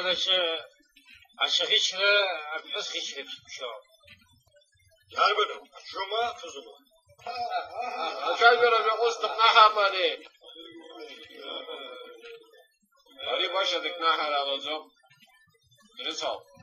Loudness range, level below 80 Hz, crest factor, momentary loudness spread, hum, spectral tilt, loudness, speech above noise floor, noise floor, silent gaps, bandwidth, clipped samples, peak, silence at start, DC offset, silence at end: 10 LU; -76 dBFS; 22 dB; 24 LU; none; 0 dB/octave; -25 LUFS; 37 dB; -64 dBFS; none; 13.5 kHz; under 0.1%; -6 dBFS; 0 s; under 0.1%; 0.25 s